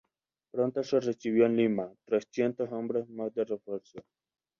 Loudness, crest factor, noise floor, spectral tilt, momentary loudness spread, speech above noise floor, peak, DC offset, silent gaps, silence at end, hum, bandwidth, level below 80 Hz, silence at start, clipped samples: -31 LUFS; 18 dB; -79 dBFS; -7 dB/octave; 11 LU; 49 dB; -12 dBFS; under 0.1%; none; 0.6 s; none; 7.2 kHz; -76 dBFS; 0.55 s; under 0.1%